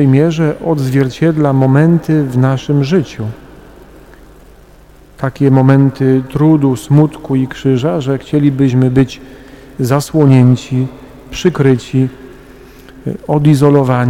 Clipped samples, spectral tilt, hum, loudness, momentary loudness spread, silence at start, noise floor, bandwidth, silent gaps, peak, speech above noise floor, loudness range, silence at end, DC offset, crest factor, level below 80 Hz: under 0.1%; -8 dB/octave; none; -12 LUFS; 12 LU; 0 s; -40 dBFS; 14.5 kHz; none; 0 dBFS; 29 dB; 4 LU; 0 s; under 0.1%; 12 dB; -40 dBFS